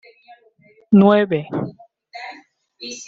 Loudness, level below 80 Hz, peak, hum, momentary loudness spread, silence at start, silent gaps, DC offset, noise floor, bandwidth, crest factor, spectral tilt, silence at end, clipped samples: -16 LUFS; -60 dBFS; -2 dBFS; none; 23 LU; 0.9 s; none; under 0.1%; -54 dBFS; 7.6 kHz; 18 dB; -7 dB/octave; 0.05 s; under 0.1%